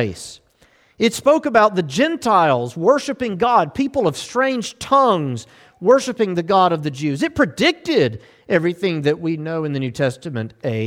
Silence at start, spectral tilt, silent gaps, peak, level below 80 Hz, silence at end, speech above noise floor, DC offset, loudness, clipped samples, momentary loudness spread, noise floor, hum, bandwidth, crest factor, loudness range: 0 s; -5.5 dB/octave; none; -2 dBFS; -54 dBFS; 0 s; 37 dB; under 0.1%; -18 LUFS; under 0.1%; 10 LU; -55 dBFS; none; 16.5 kHz; 16 dB; 3 LU